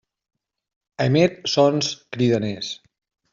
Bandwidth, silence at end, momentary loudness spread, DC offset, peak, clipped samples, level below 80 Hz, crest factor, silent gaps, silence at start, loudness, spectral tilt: 7.6 kHz; 0.6 s; 12 LU; under 0.1%; -4 dBFS; under 0.1%; -60 dBFS; 18 dB; none; 1 s; -21 LUFS; -5.5 dB/octave